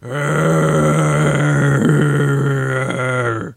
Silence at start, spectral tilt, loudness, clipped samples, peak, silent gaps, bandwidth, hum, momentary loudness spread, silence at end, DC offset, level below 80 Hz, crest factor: 0 s; -6.5 dB/octave; -15 LUFS; under 0.1%; 0 dBFS; none; 14.5 kHz; none; 5 LU; 0.05 s; under 0.1%; -44 dBFS; 16 dB